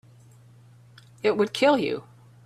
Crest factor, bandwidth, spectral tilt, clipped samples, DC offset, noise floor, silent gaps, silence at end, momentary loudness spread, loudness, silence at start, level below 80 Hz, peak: 18 dB; 13.5 kHz; -5 dB/octave; under 0.1%; under 0.1%; -52 dBFS; none; 0.45 s; 9 LU; -24 LUFS; 1.25 s; -70 dBFS; -8 dBFS